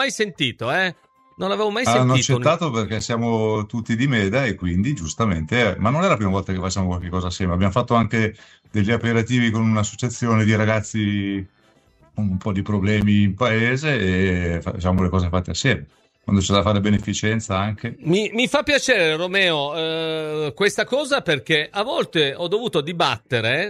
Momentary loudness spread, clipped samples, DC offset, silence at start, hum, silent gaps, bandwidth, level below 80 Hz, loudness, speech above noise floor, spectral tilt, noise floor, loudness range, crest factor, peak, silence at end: 7 LU; under 0.1%; under 0.1%; 0 s; none; none; 12.5 kHz; -44 dBFS; -20 LUFS; 36 dB; -5 dB/octave; -56 dBFS; 2 LU; 18 dB; -2 dBFS; 0 s